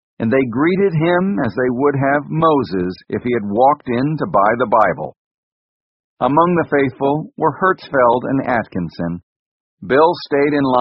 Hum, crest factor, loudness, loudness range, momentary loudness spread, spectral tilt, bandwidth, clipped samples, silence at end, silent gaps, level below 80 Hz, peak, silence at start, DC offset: none; 16 dB; -16 LUFS; 2 LU; 9 LU; -6 dB/octave; 5.8 kHz; under 0.1%; 0 s; 5.17-6.17 s, 9.23-9.77 s; -52 dBFS; 0 dBFS; 0.2 s; under 0.1%